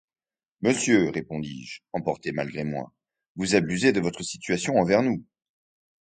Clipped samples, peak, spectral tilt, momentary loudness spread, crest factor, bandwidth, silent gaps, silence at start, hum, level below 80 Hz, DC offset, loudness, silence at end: under 0.1%; -6 dBFS; -5 dB/octave; 13 LU; 20 dB; 9.6 kHz; 3.28-3.35 s; 0.6 s; none; -58 dBFS; under 0.1%; -25 LUFS; 0.9 s